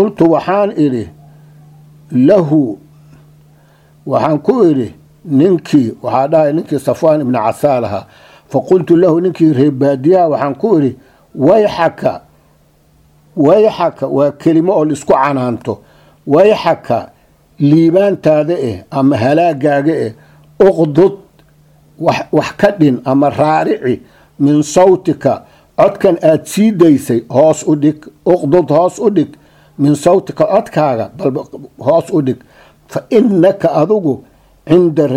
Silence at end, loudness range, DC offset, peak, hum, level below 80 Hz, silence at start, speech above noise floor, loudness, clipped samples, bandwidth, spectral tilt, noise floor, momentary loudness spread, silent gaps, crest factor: 0 s; 3 LU; under 0.1%; 0 dBFS; none; -50 dBFS; 0 s; 39 dB; -12 LUFS; 0.1%; 14.5 kHz; -7.5 dB/octave; -50 dBFS; 10 LU; none; 12 dB